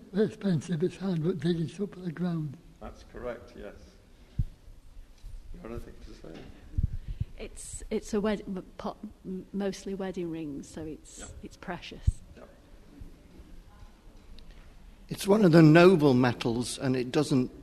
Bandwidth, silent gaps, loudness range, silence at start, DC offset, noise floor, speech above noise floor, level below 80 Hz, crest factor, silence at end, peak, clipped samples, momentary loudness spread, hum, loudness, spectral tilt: 13.5 kHz; none; 19 LU; 0.1 s; under 0.1%; -52 dBFS; 25 dB; -44 dBFS; 22 dB; 0 s; -6 dBFS; under 0.1%; 24 LU; none; -28 LUFS; -6.5 dB/octave